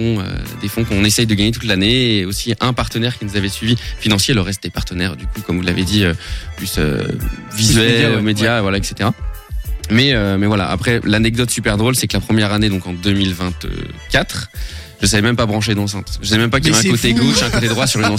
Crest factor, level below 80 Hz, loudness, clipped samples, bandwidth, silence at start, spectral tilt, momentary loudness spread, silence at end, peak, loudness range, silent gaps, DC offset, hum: 14 dB; -30 dBFS; -16 LUFS; under 0.1%; 16.5 kHz; 0 s; -4.5 dB/octave; 12 LU; 0 s; -2 dBFS; 3 LU; none; under 0.1%; none